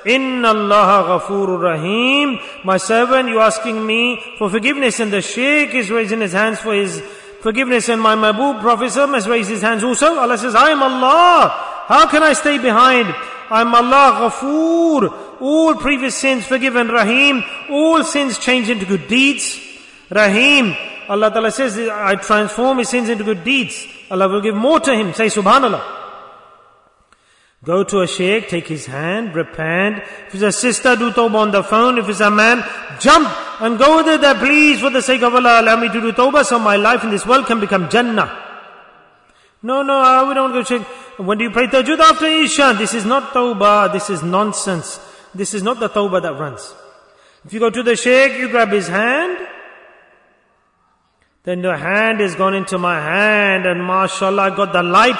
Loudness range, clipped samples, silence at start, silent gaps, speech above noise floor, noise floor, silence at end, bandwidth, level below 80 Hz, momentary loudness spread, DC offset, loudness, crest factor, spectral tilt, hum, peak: 7 LU; under 0.1%; 0 s; none; 46 dB; -60 dBFS; 0 s; 11 kHz; -52 dBFS; 11 LU; under 0.1%; -14 LUFS; 14 dB; -3.5 dB/octave; none; 0 dBFS